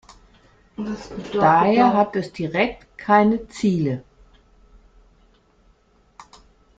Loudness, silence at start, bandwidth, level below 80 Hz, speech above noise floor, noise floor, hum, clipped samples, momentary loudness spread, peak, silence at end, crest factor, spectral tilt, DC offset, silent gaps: -20 LUFS; 0.8 s; 8 kHz; -52 dBFS; 39 dB; -58 dBFS; none; under 0.1%; 16 LU; -2 dBFS; 2.8 s; 20 dB; -7 dB/octave; under 0.1%; none